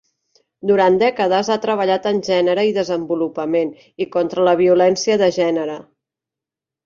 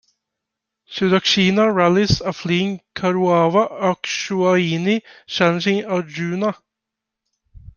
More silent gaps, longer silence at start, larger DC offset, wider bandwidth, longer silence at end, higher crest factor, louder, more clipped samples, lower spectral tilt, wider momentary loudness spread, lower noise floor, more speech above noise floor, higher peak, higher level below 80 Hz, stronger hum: neither; second, 0.65 s vs 0.9 s; neither; about the same, 7.6 kHz vs 7.2 kHz; first, 1.05 s vs 0.1 s; about the same, 16 dB vs 18 dB; about the same, -17 LUFS vs -18 LUFS; neither; about the same, -5 dB/octave vs -5.5 dB/octave; about the same, 9 LU vs 9 LU; first, -87 dBFS vs -83 dBFS; first, 70 dB vs 65 dB; about the same, -2 dBFS vs 0 dBFS; second, -62 dBFS vs -48 dBFS; neither